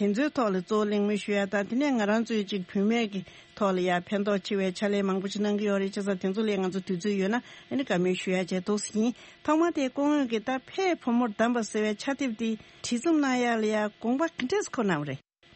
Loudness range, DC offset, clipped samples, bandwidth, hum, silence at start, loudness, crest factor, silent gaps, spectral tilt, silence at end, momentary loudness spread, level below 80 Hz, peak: 1 LU; under 0.1%; under 0.1%; 8.8 kHz; none; 0 s; -28 LUFS; 16 dB; none; -5.5 dB/octave; 0.4 s; 6 LU; -70 dBFS; -12 dBFS